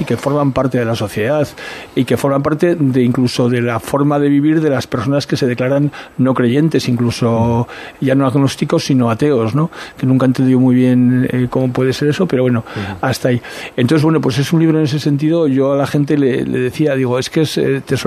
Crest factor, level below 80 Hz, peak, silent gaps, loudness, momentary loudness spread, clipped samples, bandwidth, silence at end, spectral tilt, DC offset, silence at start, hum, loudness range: 14 dB; -48 dBFS; 0 dBFS; none; -14 LUFS; 6 LU; under 0.1%; 14 kHz; 0 s; -7 dB/octave; under 0.1%; 0 s; none; 2 LU